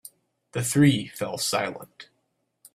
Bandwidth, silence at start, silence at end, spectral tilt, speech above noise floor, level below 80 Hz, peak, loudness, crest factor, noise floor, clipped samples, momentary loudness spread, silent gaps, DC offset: 15.5 kHz; 0.55 s; 0.7 s; -4.5 dB/octave; 50 dB; -64 dBFS; -8 dBFS; -24 LUFS; 20 dB; -74 dBFS; under 0.1%; 18 LU; none; under 0.1%